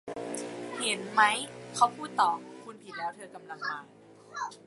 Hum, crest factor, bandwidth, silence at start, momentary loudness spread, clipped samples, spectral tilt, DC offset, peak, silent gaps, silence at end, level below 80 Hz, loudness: none; 24 dB; 11.5 kHz; 0.05 s; 20 LU; under 0.1%; -2 dB/octave; under 0.1%; -8 dBFS; none; 0.05 s; -78 dBFS; -30 LUFS